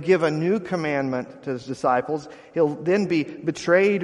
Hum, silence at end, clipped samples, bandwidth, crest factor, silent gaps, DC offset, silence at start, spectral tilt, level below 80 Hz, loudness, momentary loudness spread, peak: none; 0 s; under 0.1%; 11 kHz; 18 dB; none; under 0.1%; 0 s; -6.5 dB/octave; -64 dBFS; -23 LUFS; 11 LU; -4 dBFS